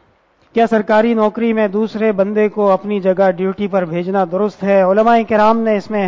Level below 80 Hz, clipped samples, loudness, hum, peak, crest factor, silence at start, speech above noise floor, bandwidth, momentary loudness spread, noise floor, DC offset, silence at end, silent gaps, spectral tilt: -54 dBFS; under 0.1%; -14 LUFS; none; -2 dBFS; 12 dB; 0.55 s; 41 dB; 7.6 kHz; 6 LU; -54 dBFS; under 0.1%; 0 s; none; -8 dB/octave